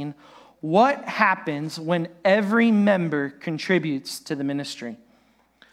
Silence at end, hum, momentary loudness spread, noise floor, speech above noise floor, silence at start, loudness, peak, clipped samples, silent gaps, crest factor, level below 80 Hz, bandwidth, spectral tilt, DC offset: 0.75 s; none; 13 LU; -61 dBFS; 38 dB; 0 s; -22 LUFS; -2 dBFS; under 0.1%; none; 20 dB; -74 dBFS; 14.5 kHz; -6 dB/octave; under 0.1%